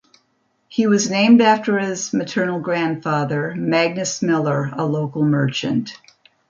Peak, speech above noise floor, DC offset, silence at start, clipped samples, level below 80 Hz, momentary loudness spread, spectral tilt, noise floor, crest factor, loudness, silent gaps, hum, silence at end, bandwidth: -2 dBFS; 48 dB; under 0.1%; 0.7 s; under 0.1%; -64 dBFS; 9 LU; -5 dB/octave; -66 dBFS; 16 dB; -19 LUFS; none; none; 0.55 s; 7.6 kHz